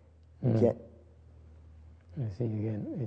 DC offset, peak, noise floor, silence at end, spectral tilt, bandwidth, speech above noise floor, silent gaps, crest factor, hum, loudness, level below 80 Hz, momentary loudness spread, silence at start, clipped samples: under 0.1%; -12 dBFS; -55 dBFS; 0 s; -10.5 dB/octave; 6.2 kHz; 25 dB; none; 22 dB; none; -32 LUFS; -60 dBFS; 14 LU; 0.4 s; under 0.1%